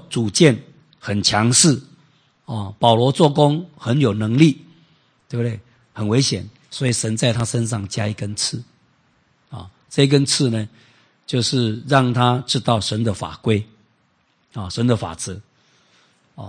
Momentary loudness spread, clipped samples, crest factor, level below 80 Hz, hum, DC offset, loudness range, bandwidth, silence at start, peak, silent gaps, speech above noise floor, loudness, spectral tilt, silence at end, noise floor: 18 LU; under 0.1%; 20 dB; -56 dBFS; none; under 0.1%; 6 LU; 10 kHz; 0.1 s; 0 dBFS; none; 45 dB; -19 LUFS; -4.5 dB/octave; 0 s; -63 dBFS